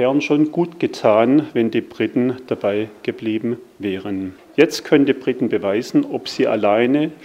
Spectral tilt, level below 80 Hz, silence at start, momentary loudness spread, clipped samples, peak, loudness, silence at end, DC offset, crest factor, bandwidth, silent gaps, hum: -6 dB/octave; -66 dBFS; 0 s; 10 LU; under 0.1%; 0 dBFS; -19 LUFS; 0 s; under 0.1%; 18 dB; 15.5 kHz; none; none